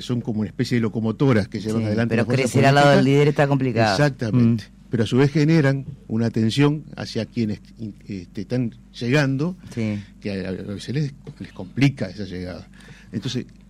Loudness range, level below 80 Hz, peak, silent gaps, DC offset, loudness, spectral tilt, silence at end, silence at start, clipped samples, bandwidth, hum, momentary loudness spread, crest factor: 9 LU; -50 dBFS; -8 dBFS; none; under 0.1%; -21 LUFS; -6.5 dB/octave; 0.2 s; 0 s; under 0.1%; 12.5 kHz; none; 15 LU; 14 dB